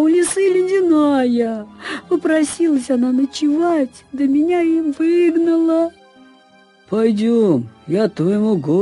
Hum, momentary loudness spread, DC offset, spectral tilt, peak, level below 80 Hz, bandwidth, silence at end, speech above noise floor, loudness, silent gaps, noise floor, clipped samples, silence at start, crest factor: none; 7 LU; under 0.1%; -6 dB/octave; -4 dBFS; -58 dBFS; 11.5 kHz; 0 s; 34 dB; -17 LUFS; none; -50 dBFS; under 0.1%; 0 s; 12 dB